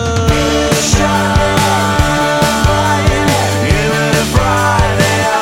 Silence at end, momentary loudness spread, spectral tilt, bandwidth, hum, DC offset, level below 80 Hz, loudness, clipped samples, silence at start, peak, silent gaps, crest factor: 0 s; 1 LU; -4.5 dB/octave; 16.5 kHz; none; under 0.1%; -22 dBFS; -12 LUFS; under 0.1%; 0 s; 0 dBFS; none; 12 dB